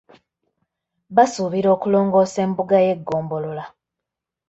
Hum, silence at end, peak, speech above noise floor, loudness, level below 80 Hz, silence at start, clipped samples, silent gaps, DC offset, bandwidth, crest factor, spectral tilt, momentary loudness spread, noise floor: none; 0.8 s; -2 dBFS; 66 dB; -19 LUFS; -62 dBFS; 1.1 s; under 0.1%; none; under 0.1%; 8.2 kHz; 18 dB; -6.5 dB/octave; 11 LU; -84 dBFS